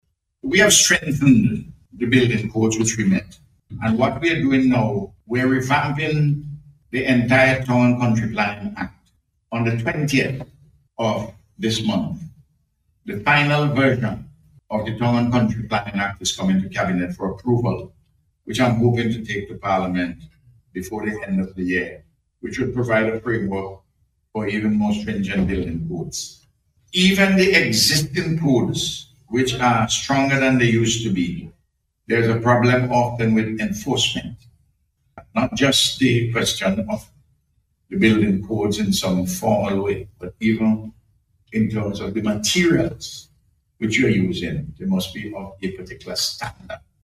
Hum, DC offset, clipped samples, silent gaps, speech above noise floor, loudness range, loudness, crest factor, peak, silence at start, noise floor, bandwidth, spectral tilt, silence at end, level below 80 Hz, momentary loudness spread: none; under 0.1%; under 0.1%; none; 49 dB; 6 LU; -20 LUFS; 20 dB; 0 dBFS; 0.45 s; -69 dBFS; 15.5 kHz; -4.5 dB/octave; 0.25 s; -46 dBFS; 14 LU